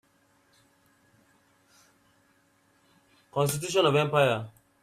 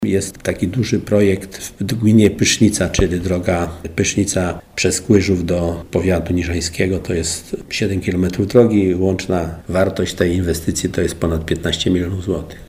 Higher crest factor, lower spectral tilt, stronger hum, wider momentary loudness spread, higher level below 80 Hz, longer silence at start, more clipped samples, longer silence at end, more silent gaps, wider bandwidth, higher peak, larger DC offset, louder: first, 22 dB vs 16 dB; about the same, -4.5 dB/octave vs -5 dB/octave; neither; first, 12 LU vs 8 LU; second, -68 dBFS vs -34 dBFS; first, 3.35 s vs 0 s; neither; first, 0.35 s vs 0.05 s; neither; about the same, 15.5 kHz vs 16 kHz; second, -10 dBFS vs 0 dBFS; neither; second, -26 LUFS vs -17 LUFS